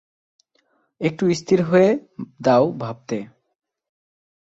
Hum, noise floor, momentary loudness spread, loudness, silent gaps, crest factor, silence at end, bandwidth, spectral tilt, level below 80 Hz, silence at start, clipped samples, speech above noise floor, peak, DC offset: none; -66 dBFS; 14 LU; -20 LUFS; none; 18 dB; 1.25 s; 8 kHz; -6.5 dB/octave; -62 dBFS; 1 s; under 0.1%; 46 dB; -4 dBFS; under 0.1%